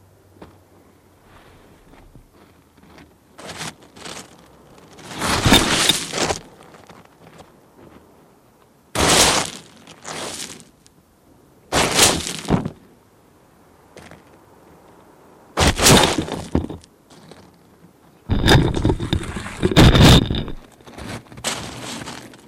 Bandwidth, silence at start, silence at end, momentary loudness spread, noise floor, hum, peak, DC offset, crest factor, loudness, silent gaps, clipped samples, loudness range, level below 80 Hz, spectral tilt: 16 kHz; 0.4 s; 0.2 s; 23 LU; -53 dBFS; none; 0 dBFS; under 0.1%; 20 dB; -17 LUFS; none; under 0.1%; 15 LU; -32 dBFS; -3.5 dB/octave